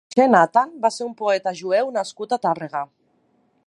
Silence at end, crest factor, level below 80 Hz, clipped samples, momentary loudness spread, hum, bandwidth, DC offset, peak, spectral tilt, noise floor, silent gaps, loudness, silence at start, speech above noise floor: 0.8 s; 20 dB; -76 dBFS; under 0.1%; 12 LU; none; 11.5 kHz; under 0.1%; 0 dBFS; -5 dB/octave; -64 dBFS; none; -21 LUFS; 0.15 s; 44 dB